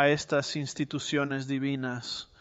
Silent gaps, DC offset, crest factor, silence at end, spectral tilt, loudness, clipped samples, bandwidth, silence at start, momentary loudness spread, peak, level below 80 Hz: none; under 0.1%; 20 dB; 0.15 s; -4.5 dB/octave; -30 LUFS; under 0.1%; 8.2 kHz; 0 s; 6 LU; -10 dBFS; -66 dBFS